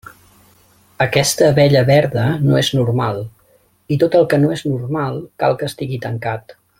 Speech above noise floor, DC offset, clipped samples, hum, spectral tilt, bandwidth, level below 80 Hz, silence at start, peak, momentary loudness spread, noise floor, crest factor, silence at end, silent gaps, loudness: 40 dB; under 0.1%; under 0.1%; none; -5.5 dB/octave; 16.5 kHz; -50 dBFS; 1 s; 0 dBFS; 12 LU; -55 dBFS; 16 dB; 0.3 s; none; -16 LUFS